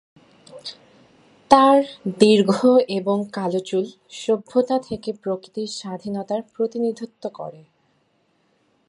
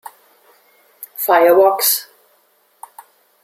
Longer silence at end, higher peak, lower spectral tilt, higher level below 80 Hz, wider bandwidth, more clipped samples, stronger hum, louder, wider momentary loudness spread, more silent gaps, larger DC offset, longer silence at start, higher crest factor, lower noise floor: about the same, 1.35 s vs 1.4 s; about the same, 0 dBFS vs -2 dBFS; first, -5.5 dB/octave vs -1.5 dB/octave; first, -62 dBFS vs -70 dBFS; second, 11.5 kHz vs 16 kHz; neither; neither; second, -20 LUFS vs -13 LUFS; second, 17 LU vs 20 LU; neither; neither; second, 0.55 s vs 1 s; about the same, 22 dB vs 18 dB; first, -65 dBFS vs -58 dBFS